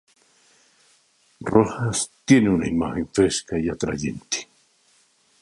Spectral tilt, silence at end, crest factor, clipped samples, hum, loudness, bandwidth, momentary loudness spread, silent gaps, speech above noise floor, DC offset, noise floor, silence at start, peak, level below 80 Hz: -5 dB/octave; 1 s; 22 dB; under 0.1%; none; -22 LUFS; 11.5 kHz; 11 LU; none; 40 dB; under 0.1%; -61 dBFS; 1.4 s; -2 dBFS; -48 dBFS